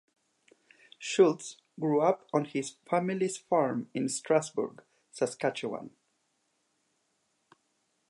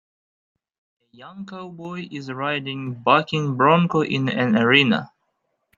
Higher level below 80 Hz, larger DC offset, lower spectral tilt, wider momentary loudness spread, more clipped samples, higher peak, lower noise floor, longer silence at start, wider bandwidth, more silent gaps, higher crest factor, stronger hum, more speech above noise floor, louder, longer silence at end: second, -84 dBFS vs -64 dBFS; neither; second, -5 dB/octave vs -6.5 dB/octave; second, 14 LU vs 20 LU; neither; second, -10 dBFS vs -2 dBFS; about the same, -76 dBFS vs -73 dBFS; second, 1 s vs 1.2 s; first, 11.5 kHz vs 7.4 kHz; neither; about the same, 22 dB vs 20 dB; neither; second, 47 dB vs 52 dB; second, -30 LUFS vs -19 LUFS; first, 2.2 s vs 0.7 s